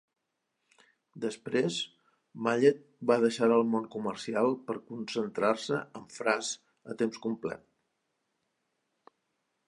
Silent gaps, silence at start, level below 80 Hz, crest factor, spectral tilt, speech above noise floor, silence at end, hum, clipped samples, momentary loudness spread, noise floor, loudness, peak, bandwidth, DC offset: none; 1.15 s; -78 dBFS; 22 dB; -4.5 dB/octave; 52 dB; 2.1 s; none; under 0.1%; 13 LU; -82 dBFS; -31 LUFS; -10 dBFS; 11 kHz; under 0.1%